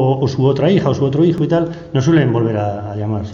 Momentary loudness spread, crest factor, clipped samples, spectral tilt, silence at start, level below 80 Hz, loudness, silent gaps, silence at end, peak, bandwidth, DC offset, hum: 8 LU; 12 dB; under 0.1%; -8 dB/octave; 0 s; -46 dBFS; -16 LUFS; none; 0 s; -4 dBFS; 7.2 kHz; under 0.1%; none